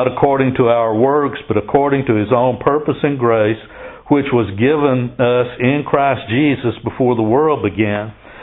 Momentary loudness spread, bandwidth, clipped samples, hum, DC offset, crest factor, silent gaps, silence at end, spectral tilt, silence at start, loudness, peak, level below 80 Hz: 5 LU; 4 kHz; under 0.1%; none; under 0.1%; 14 dB; none; 0 s; -12 dB/octave; 0 s; -15 LUFS; 0 dBFS; -46 dBFS